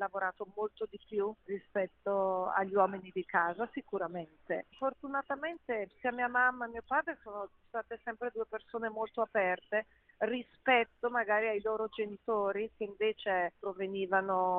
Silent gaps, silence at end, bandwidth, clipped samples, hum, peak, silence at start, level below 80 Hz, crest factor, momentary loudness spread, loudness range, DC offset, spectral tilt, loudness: none; 0 s; 4.1 kHz; under 0.1%; none; -14 dBFS; 0 s; -72 dBFS; 20 dB; 11 LU; 4 LU; under 0.1%; -2.5 dB/octave; -35 LUFS